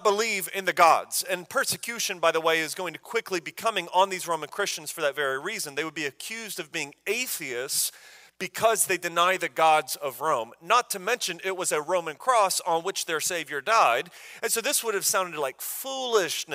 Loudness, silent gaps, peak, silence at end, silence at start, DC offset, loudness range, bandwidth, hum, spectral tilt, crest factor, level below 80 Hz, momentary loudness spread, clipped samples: -26 LUFS; none; -6 dBFS; 0 s; 0 s; under 0.1%; 5 LU; 16 kHz; none; -1 dB/octave; 22 dB; -76 dBFS; 10 LU; under 0.1%